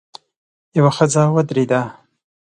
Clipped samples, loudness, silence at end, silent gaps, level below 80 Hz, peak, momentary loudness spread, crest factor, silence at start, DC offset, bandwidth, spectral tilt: under 0.1%; -16 LUFS; 0.5 s; none; -60 dBFS; 0 dBFS; 8 LU; 18 dB; 0.75 s; under 0.1%; 9.8 kHz; -6 dB/octave